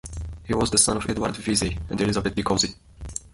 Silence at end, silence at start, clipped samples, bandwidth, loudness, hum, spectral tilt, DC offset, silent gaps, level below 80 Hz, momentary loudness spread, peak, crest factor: 0.05 s; 0.05 s; under 0.1%; 11.5 kHz; -23 LUFS; none; -3.5 dB/octave; under 0.1%; none; -38 dBFS; 17 LU; -6 dBFS; 20 dB